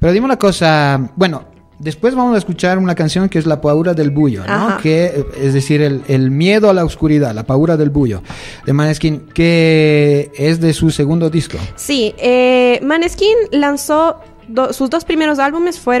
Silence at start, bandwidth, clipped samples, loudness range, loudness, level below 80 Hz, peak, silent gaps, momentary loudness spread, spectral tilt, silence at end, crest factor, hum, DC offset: 0 s; 13.5 kHz; under 0.1%; 1 LU; -13 LUFS; -36 dBFS; 0 dBFS; none; 7 LU; -6.5 dB/octave; 0 s; 12 dB; none; under 0.1%